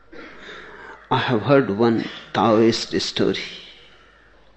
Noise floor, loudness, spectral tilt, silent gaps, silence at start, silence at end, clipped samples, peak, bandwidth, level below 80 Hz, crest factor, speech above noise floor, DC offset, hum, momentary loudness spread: -52 dBFS; -20 LUFS; -5.5 dB/octave; none; 0.15 s; 0.85 s; under 0.1%; -4 dBFS; 9 kHz; -56 dBFS; 18 dB; 33 dB; under 0.1%; none; 22 LU